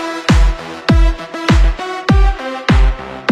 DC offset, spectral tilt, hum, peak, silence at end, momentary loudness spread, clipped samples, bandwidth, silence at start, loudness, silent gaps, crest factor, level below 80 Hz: under 0.1%; -6 dB/octave; none; 0 dBFS; 0 s; 7 LU; under 0.1%; 9.8 kHz; 0 s; -15 LUFS; none; 12 dB; -14 dBFS